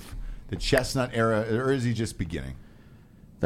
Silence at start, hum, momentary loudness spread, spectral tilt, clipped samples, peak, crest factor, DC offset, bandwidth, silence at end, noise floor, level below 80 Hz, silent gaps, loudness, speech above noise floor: 0 s; none; 17 LU; -5.5 dB/octave; under 0.1%; -6 dBFS; 22 dB; under 0.1%; 15.5 kHz; 0 s; -51 dBFS; -40 dBFS; none; -27 LUFS; 25 dB